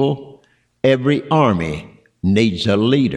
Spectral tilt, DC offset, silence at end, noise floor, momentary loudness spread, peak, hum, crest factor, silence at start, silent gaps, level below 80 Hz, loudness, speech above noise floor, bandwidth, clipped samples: -7 dB/octave; under 0.1%; 0 s; -51 dBFS; 10 LU; -4 dBFS; none; 14 dB; 0 s; none; -46 dBFS; -17 LUFS; 35 dB; 11 kHz; under 0.1%